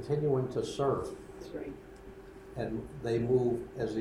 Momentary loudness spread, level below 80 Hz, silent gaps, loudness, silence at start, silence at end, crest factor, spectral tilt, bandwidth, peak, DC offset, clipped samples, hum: 20 LU; -56 dBFS; none; -33 LUFS; 0 s; 0 s; 16 dB; -7.5 dB/octave; 12.5 kHz; -16 dBFS; under 0.1%; under 0.1%; none